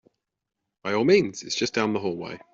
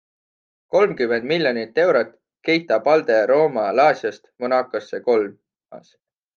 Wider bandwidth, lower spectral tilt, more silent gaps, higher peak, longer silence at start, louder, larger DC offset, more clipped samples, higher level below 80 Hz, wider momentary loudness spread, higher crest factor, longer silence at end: first, 7.8 kHz vs 7 kHz; second, -4.5 dB/octave vs -6 dB/octave; neither; second, -6 dBFS vs -2 dBFS; about the same, 0.85 s vs 0.75 s; second, -24 LUFS vs -19 LUFS; neither; neither; first, -64 dBFS vs -72 dBFS; about the same, 13 LU vs 11 LU; about the same, 20 dB vs 18 dB; second, 0.15 s vs 0.6 s